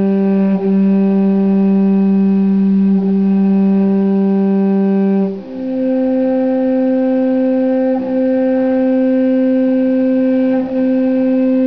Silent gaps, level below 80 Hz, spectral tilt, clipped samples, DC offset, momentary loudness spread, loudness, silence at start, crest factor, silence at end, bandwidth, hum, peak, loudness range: none; -54 dBFS; -11.5 dB/octave; under 0.1%; 0.5%; 3 LU; -14 LUFS; 0 s; 6 dB; 0 s; 5.4 kHz; none; -6 dBFS; 2 LU